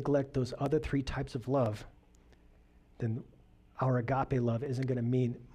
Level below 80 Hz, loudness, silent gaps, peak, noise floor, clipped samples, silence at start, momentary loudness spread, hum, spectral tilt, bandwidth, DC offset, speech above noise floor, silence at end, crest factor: -52 dBFS; -33 LUFS; none; -18 dBFS; -61 dBFS; under 0.1%; 0 s; 7 LU; none; -8 dB/octave; 9.8 kHz; under 0.1%; 29 dB; 0.1 s; 14 dB